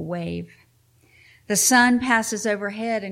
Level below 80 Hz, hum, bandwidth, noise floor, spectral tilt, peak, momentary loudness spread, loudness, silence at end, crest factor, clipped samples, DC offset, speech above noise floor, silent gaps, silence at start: -58 dBFS; none; 16.5 kHz; -59 dBFS; -2.5 dB/octave; -6 dBFS; 14 LU; -20 LUFS; 0 s; 18 dB; under 0.1%; under 0.1%; 38 dB; none; 0 s